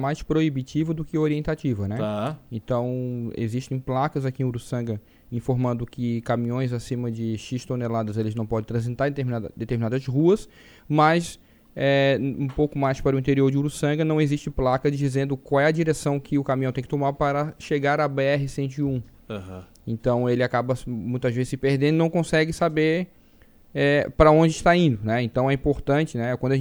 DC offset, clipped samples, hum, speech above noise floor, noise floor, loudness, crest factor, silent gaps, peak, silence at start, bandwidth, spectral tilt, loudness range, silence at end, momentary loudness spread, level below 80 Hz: under 0.1%; under 0.1%; none; 30 dB; -53 dBFS; -24 LUFS; 22 dB; none; 0 dBFS; 0 s; over 20 kHz; -7 dB/octave; 6 LU; 0 s; 9 LU; -44 dBFS